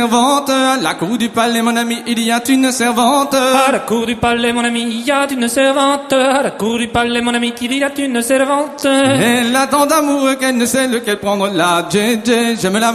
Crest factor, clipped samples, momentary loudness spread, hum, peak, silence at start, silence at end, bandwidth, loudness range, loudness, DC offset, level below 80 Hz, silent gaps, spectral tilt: 14 dB; under 0.1%; 5 LU; none; 0 dBFS; 0 s; 0 s; 15.5 kHz; 1 LU; -14 LUFS; under 0.1%; -48 dBFS; none; -3.5 dB/octave